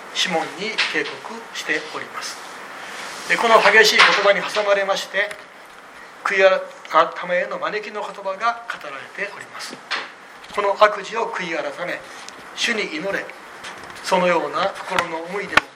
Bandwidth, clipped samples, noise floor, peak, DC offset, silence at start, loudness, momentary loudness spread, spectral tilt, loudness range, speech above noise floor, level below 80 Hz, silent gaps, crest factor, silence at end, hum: 16.5 kHz; under 0.1%; -42 dBFS; 0 dBFS; under 0.1%; 0 s; -19 LUFS; 20 LU; -2 dB/octave; 9 LU; 22 dB; -64 dBFS; none; 22 dB; 0 s; none